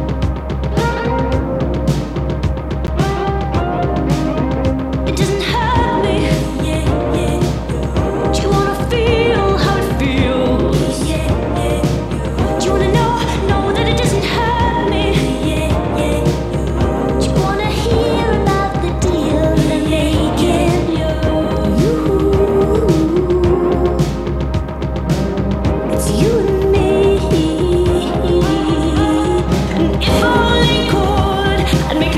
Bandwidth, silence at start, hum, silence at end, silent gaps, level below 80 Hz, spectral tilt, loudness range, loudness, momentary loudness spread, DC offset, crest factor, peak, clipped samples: 14.5 kHz; 0 s; none; 0 s; none; -22 dBFS; -6.5 dB/octave; 2 LU; -15 LUFS; 5 LU; under 0.1%; 14 dB; 0 dBFS; under 0.1%